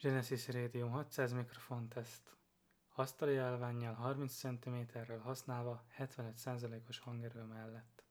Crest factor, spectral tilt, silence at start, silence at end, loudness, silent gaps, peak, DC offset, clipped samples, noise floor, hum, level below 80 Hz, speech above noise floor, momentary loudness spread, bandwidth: 20 dB; -6 dB/octave; 0 s; 0.2 s; -44 LUFS; none; -24 dBFS; under 0.1%; under 0.1%; -77 dBFS; none; -86 dBFS; 34 dB; 12 LU; over 20 kHz